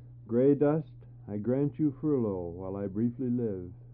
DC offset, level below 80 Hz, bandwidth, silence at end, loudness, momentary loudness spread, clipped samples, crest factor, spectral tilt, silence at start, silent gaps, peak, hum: under 0.1%; -60 dBFS; 3.6 kHz; 0 s; -30 LUFS; 13 LU; under 0.1%; 16 dB; -11.5 dB/octave; 0 s; none; -14 dBFS; none